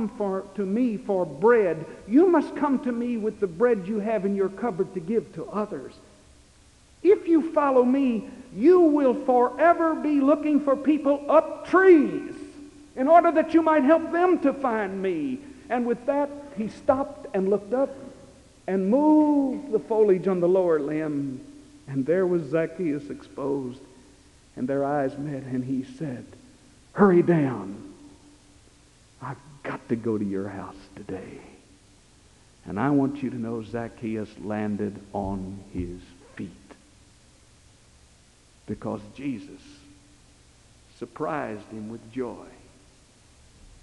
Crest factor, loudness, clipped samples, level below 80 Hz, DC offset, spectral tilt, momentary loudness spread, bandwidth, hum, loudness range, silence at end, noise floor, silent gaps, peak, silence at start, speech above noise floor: 20 dB; -24 LUFS; under 0.1%; -58 dBFS; under 0.1%; -8 dB/octave; 19 LU; 11 kHz; none; 16 LU; 1.35 s; -56 dBFS; none; -4 dBFS; 0 s; 33 dB